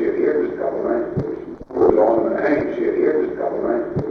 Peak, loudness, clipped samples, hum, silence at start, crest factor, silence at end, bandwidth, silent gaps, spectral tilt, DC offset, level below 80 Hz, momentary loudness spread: 0 dBFS; -20 LUFS; under 0.1%; none; 0 s; 18 dB; 0 s; 6 kHz; none; -9.5 dB/octave; under 0.1%; -48 dBFS; 9 LU